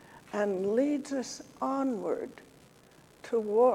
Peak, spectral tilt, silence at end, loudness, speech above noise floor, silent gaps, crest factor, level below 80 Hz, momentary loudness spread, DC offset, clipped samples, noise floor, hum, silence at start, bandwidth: -12 dBFS; -5.5 dB/octave; 0 s; -31 LUFS; 29 dB; none; 18 dB; -72 dBFS; 11 LU; under 0.1%; under 0.1%; -58 dBFS; none; 0.1 s; 13.5 kHz